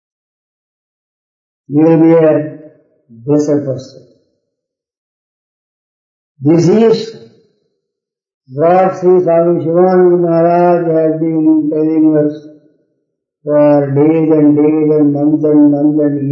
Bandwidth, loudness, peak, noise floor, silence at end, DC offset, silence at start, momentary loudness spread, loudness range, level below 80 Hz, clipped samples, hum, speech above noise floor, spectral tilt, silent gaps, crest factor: 7.4 kHz; -10 LUFS; 0 dBFS; -78 dBFS; 0 s; under 0.1%; 1.7 s; 9 LU; 9 LU; -62 dBFS; under 0.1%; none; 68 dB; -8.5 dB/octave; 4.97-6.35 s, 8.34-8.41 s; 12 dB